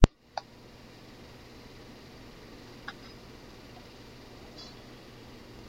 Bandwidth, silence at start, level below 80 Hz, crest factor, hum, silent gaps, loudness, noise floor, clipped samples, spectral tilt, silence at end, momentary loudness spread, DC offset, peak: 16 kHz; 0 s; -38 dBFS; 34 dB; none; none; -43 LUFS; -51 dBFS; under 0.1%; -6.5 dB/octave; 0 s; 7 LU; under 0.1%; 0 dBFS